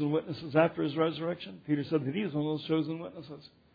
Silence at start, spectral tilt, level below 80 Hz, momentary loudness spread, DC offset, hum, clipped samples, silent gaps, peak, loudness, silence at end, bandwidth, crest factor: 0 s; -6 dB/octave; -70 dBFS; 15 LU; under 0.1%; none; under 0.1%; none; -14 dBFS; -31 LUFS; 0.3 s; 5 kHz; 18 dB